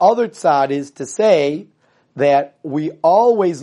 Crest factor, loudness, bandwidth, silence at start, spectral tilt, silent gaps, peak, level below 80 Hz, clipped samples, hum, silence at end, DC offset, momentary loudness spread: 16 dB; -16 LUFS; 11.5 kHz; 0 s; -5.5 dB/octave; none; 0 dBFS; -68 dBFS; under 0.1%; none; 0 s; under 0.1%; 11 LU